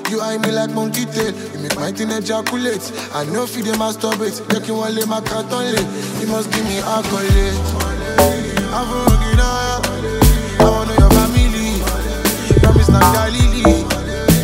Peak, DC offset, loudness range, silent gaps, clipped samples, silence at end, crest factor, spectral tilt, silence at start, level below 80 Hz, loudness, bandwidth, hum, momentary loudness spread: 0 dBFS; under 0.1%; 7 LU; none; under 0.1%; 0 s; 16 dB; -5 dB/octave; 0 s; -20 dBFS; -16 LUFS; 16.5 kHz; none; 9 LU